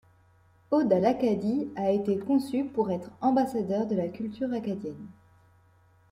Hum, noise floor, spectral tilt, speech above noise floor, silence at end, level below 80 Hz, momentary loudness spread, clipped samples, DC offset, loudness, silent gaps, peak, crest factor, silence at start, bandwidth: none; -61 dBFS; -8 dB/octave; 34 dB; 1 s; -66 dBFS; 10 LU; under 0.1%; under 0.1%; -28 LUFS; none; -12 dBFS; 18 dB; 0.7 s; 15.5 kHz